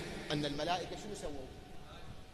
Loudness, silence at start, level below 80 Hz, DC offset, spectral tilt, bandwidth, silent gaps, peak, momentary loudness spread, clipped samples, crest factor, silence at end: -39 LUFS; 0 s; -54 dBFS; under 0.1%; -4.5 dB/octave; 13 kHz; none; -22 dBFS; 16 LU; under 0.1%; 18 dB; 0 s